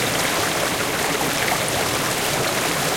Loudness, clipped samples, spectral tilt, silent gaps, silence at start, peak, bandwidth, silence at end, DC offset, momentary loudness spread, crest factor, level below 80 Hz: -20 LUFS; under 0.1%; -2.5 dB/octave; none; 0 s; -6 dBFS; 17 kHz; 0 s; under 0.1%; 1 LU; 16 dB; -46 dBFS